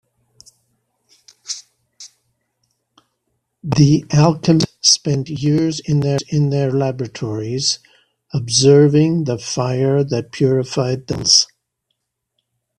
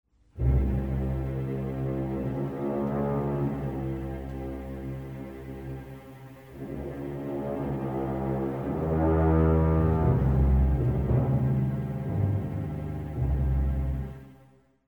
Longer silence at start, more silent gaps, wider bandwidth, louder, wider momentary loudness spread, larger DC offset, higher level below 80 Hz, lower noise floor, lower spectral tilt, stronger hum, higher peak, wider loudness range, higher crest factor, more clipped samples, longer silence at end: first, 1.5 s vs 0.35 s; neither; second, 10.5 kHz vs 18.5 kHz; first, -16 LUFS vs -28 LUFS; about the same, 13 LU vs 15 LU; neither; second, -52 dBFS vs -34 dBFS; first, -74 dBFS vs -58 dBFS; second, -5 dB/octave vs -10.5 dB/octave; neither; first, 0 dBFS vs -12 dBFS; second, 7 LU vs 12 LU; about the same, 18 dB vs 16 dB; neither; first, 1.35 s vs 0.55 s